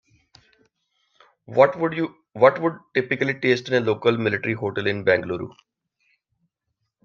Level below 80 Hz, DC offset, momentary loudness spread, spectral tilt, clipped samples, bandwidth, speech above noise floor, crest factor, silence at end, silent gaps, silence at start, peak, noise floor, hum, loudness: -68 dBFS; under 0.1%; 10 LU; -6.5 dB/octave; under 0.1%; 7 kHz; 57 dB; 22 dB; 1.55 s; none; 1.5 s; -2 dBFS; -78 dBFS; none; -22 LUFS